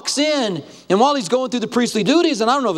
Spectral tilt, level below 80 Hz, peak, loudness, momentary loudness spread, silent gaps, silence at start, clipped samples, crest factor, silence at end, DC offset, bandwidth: -4 dB/octave; -64 dBFS; -2 dBFS; -18 LUFS; 5 LU; none; 0.05 s; under 0.1%; 16 dB; 0 s; under 0.1%; 14 kHz